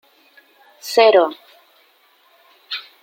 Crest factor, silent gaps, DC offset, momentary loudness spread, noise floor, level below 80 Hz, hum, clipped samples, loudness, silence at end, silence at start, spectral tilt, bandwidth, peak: 20 dB; none; under 0.1%; 22 LU; -56 dBFS; -76 dBFS; none; under 0.1%; -16 LUFS; 0.2 s; 0.85 s; -2 dB/octave; 17 kHz; -2 dBFS